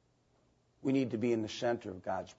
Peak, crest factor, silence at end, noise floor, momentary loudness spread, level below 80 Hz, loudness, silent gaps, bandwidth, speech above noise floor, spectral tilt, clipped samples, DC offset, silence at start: -20 dBFS; 16 dB; 0.05 s; -72 dBFS; 7 LU; -74 dBFS; -35 LUFS; none; 7.6 kHz; 38 dB; -5.5 dB/octave; under 0.1%; under 0.1%; 0.85 s